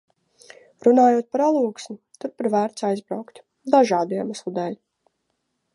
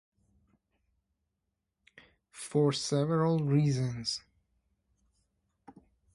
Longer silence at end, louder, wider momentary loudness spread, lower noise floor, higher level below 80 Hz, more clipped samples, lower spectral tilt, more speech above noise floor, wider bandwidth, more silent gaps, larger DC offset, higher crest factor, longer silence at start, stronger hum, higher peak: second, 1 s vs 1.95 s; first, -21 LUFS vs -30 LUFS; first, 18 LU vs 8 LU; second, -75 dBFS vs -84 dBFS; second, -76 dBFS vs -68 dBFS; neither; about the same, -6 dB/octave vs -6 dB/octave; about the same, 54 dB vs 56 dB; about the same, 11.5 kHz vs 11.5 kHz; neither; neither; about the same, 20 dB vs 18 dB; second, 0.85 s vs 2.35 s; neither; first, -2 dBFS vs -16 dBFS